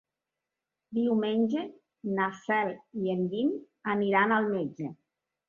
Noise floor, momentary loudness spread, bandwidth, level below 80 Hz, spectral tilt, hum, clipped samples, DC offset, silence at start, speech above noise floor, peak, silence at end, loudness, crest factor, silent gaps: -88 dBFS; 11 LU; 7 kHz; -76 dBFS; -7.5 dB/octave; none; under 0.1%; under 0.1%; 0.9 s; 59 dB; -10 dBFS; 0.55 s; -29 LUFS; 20 dB; none